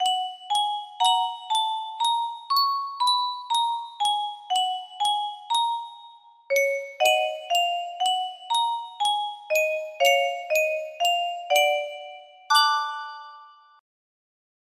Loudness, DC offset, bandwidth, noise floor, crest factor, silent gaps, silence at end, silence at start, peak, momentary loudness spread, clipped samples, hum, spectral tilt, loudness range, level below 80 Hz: -24 LUFS; under 0.1%; 16 kHz; -50 dBFS; 18 dB; none; 1.3 s; 0 s; -6 dBFS; 7 LU; under 0.1%; none; 3 dB/octave; 2 LU; -80 dBFS